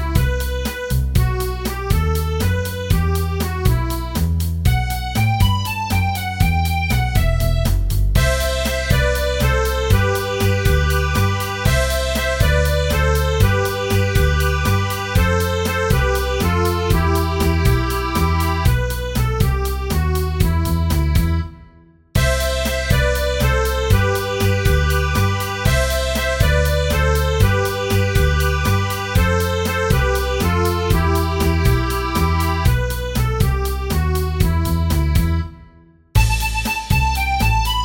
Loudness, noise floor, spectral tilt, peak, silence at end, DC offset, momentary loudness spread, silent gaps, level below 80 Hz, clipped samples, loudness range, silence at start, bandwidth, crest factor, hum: -18 LUFS; -48 dBFS; -5 dB/octave; 0 dBFS; 0 s; under 0.1%; 4 LU; none; -22 dBFS; under 0.1%; 2 LU; 0 s; 17 kHz; 16 dB; none